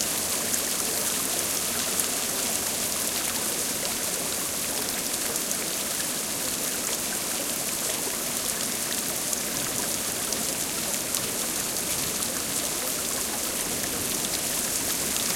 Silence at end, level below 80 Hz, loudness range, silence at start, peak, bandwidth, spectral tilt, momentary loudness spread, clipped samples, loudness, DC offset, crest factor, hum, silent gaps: 0 s; -56 dBFS; 1 LU; 0 s; -2 dBFS; 17 kHz; -1 dB/octave; 2 LU; under 0.1%; -25 LUFS; under 0.1%; 26 dB; none; none